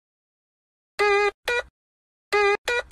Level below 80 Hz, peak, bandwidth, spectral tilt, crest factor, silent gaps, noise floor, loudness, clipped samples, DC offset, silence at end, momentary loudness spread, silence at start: -56 dBFS; -10 dBFS; 12.5 kHz; -2 dB/octave; 16 dB; 1.34-1.43 s, 1.70-2.31 s, 2.58-2.65 s; under -90 dBFS; -23 LUFS; under 0.1%; under 0.1%; 0.1 s; 7 LU; 1 s